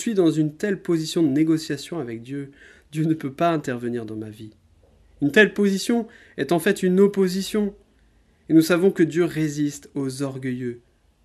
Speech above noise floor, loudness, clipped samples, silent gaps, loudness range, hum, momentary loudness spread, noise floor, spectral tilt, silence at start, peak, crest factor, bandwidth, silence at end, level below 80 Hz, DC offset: 37 dB; -22 LUFS; under 0.1%; none; 5 LU; none; 15 LU; -58 dBFS; -6 dB/octave; 0 s; 0 dBFS; 22 dB; 14.5 kHz; 0.45 s; -60 dBFS; under 0.1%